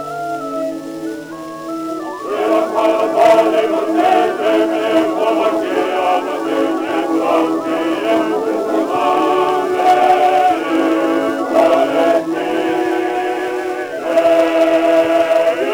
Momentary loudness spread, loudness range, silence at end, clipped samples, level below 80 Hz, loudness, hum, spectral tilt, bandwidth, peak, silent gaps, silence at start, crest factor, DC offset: 10 LU; 3 LU; 0 s; under 0.1%; -62 dBFS; -15 LUFS; none; -4.5 dB/octave; over 20 kHz; 0 dBFS; none; 0 s; 14 dB; under 0.1%